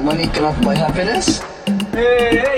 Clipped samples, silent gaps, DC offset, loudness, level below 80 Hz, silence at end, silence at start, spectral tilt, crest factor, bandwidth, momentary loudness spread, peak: under 0.1%; none; under 0.1%; -16 LUFS; -32 dBFS; 0 s; 0 s; -4.5 dB/octave; 14 dB; 16 kHz; 7 LU; -2 dBFS